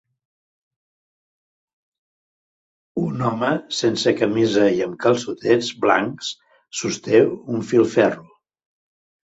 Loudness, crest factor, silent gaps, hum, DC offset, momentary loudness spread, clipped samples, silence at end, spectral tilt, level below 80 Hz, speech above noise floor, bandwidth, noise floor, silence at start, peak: -20 LUFS; 20 dB; none; none; under 0.1%; 12 LU; under 0.1%; 1.15 s; -5 dB/octave; -62 dBFS; over 71 dB; 8 kHz; under -90 dBFS; 2.95 s; -2 dBFS